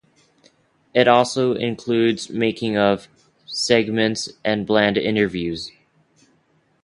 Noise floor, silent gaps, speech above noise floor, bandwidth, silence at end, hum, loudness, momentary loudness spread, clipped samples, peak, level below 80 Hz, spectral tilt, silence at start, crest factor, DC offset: -62 dBFS; none; 43 dB; 11.5 kHz; 1.15 s; none; -20 LUFS; 10 LU; under 0.1%; 0 dBFS; -56 dBFS; -4.5 dB/octave; 0.95 s; 20 dB; under 0.1%